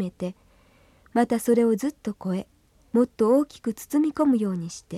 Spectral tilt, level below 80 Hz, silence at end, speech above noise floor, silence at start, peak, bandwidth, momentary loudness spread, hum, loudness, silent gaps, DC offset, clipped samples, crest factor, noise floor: -6.5 dB/octave; -62 dBFS; 0 s; 34 dB; 0 s; -8 dBFS; 15 kHz; 11 LU; none; -25 LUFS; none; under 0.1%; under 0.1%; 16 dB; -58 dBFS